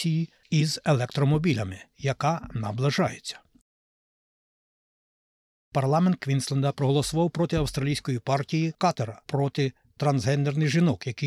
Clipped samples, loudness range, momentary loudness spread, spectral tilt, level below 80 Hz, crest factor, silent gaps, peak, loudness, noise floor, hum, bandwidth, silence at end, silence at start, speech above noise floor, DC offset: under 0.1%; 6 LU; 8 LU; -6 dB/octave; -52 dBFS; 14 dB; 3.61-5.72 s; -12 dBFS; -26 LUFS; under -90 dBFS; none; 13 kHz; 0 s; 0 s; over 65 dB; under 0.1%